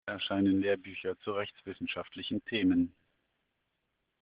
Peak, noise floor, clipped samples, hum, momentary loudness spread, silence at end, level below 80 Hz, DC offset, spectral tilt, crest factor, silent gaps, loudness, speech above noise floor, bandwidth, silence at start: -18 dBFS; -82 dBFS; under 0.1%; none; 10 LU; 1.35 s; -72 dBFS; under 0.1%; -4 dB/octave; 16 dB; none; -33 LUFS; 49 dB; 5 kHz; 0.05 s